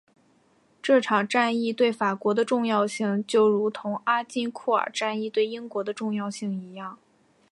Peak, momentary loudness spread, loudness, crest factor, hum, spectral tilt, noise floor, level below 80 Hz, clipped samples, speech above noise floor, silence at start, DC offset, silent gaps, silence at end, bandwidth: -8 dBFS; 11 LU; -25 LUFS; 18 dB; none; -5 dB/octave; -63 dBFS; -78 dBFS; under 0.1%; 38 dB; 0.85 s; under 0.1%; none; 0.55 s; 11.5 kHz